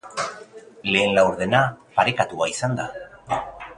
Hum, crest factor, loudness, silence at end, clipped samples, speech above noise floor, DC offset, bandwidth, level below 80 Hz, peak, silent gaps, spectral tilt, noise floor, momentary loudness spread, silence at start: none; 22 dB; -22 LUFS; 0.05 s; under 0.1%; 22 dB; under 0.1%; 11 kHz; -54 dBFS; -2 dBFS; none; -4.5 dB/octave; -43 dBFS; 12 LU; 0.05 s